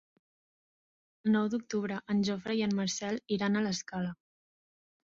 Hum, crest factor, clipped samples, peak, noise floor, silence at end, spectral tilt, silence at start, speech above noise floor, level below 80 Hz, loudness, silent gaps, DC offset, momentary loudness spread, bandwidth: none; 16 dB; under 0.1%; -18 dBFS; under -90 dBFS; 1 s; -5 dB/octave; 1.25 s; over 59 dB; -70 dBFS; -32 LUFS; none; under 0.1%; 7 LU; 7.8 kHz